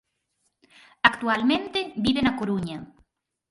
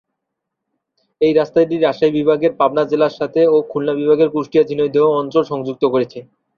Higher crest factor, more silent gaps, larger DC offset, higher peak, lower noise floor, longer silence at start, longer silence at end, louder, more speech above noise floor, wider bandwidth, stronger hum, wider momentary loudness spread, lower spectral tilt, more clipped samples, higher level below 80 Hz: first, 26 dB vs 14 dB; neither; neither; about the same, 0 dBFS vs -2 dBFS; second, -74 dBFS vs -78 dBFS; second, 1.05 s vs 1.2 s; first, 0.65 s vs 0.35 s; second, -24 LUFS vs -16 LUFS; second, 50 dB vs 63 dB; first, 11.5 kHz vs 6.6 kHz; neither; first, 9 LU vs 5 LU; second, -5.5 dB/octave vs -7.5 dB/octave; neither; first, -54 dBFS vs -60 dBFS